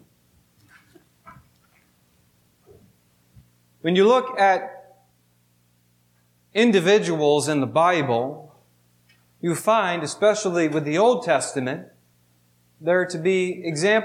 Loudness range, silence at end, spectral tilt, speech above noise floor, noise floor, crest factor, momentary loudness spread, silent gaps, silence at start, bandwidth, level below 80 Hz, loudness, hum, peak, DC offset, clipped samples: 2 LU; 0 s; -4.5 dB/octave; 43 dB; -63 dBFS; 16 dB; 12 LU; none; 1.25 s; 15.5 kHz; -72 dBFS; -21 LUFS; 60 Hz at -50 dBFS; -6 dBFS; under 0.1%; under 0.1%